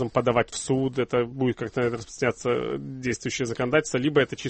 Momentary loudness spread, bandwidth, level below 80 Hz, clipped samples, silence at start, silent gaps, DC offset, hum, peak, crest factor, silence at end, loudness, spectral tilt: 6 LU; 8.8 kHz; -54 dBFS; under 0.1%; 0 s; none; under 0.1%; none; -8 dBFS; 18 dB; 0 s; -26 LUFS; -5 dB/octave